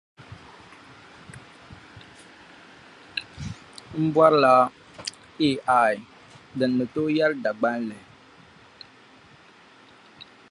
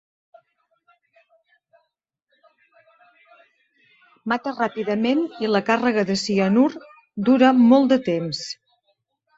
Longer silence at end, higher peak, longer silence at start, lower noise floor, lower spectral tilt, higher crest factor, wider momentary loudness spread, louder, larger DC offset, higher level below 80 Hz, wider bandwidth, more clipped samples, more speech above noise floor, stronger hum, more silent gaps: second, 0.3 s vs 0.85 s; about the same, -4 dBFS vs -2 dBFS; second, 0.2 s vs 4.25 s; second, -52 dBFS vs -77 dBFS; about the same, -6 dB/octave vs -5.5 dB/octave; about the same, 24 dB vs 20 dB; first, 28 LU vs 17 LU; second, -23 LUFS vs -20 LUFS; neither; first, -60 dBFS vs -66 dBFS; first, 11.5 kHz vs 8 kHz; neither; second, 31 dB vs 58 dB; neither; neither